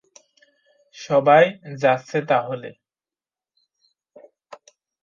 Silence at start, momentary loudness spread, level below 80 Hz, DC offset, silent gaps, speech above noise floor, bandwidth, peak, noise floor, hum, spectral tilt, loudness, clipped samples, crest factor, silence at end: 1 s; 19 LU; -70 dBFS; under 0.1%; none; over 71 dB; 7.4 kHz; -2 dBFS; under -90 dBFS; none; -6 dB/octave; -19 LUFS; under 0.1%; 20 dB; 0.5 s